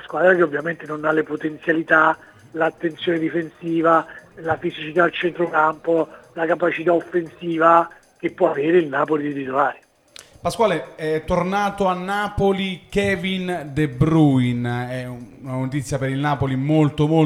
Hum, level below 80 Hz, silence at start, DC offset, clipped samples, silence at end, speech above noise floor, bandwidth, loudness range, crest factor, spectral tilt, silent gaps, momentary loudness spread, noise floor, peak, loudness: none; -48 dBFS; 0 s; under 0.1%; under 0.1%; 0 s; 27 dB; 13.5 kHz; 2 LU; 20 dB; -7 dB/octave; none; 11 LU; -47 dBFS; 0 dBFS; -20 LUFS